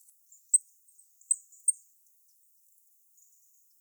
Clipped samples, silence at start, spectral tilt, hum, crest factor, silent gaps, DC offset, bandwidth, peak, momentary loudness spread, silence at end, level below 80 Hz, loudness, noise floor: under 0.1%; 0.55 s; 7.5 dB/octave; none; 24 dB; none; under 0.1%; over 20 kHz; -12 dBFS; 5 LU; 2.1 s; under -90 dBFS; -28 LUFS; -64 dBFS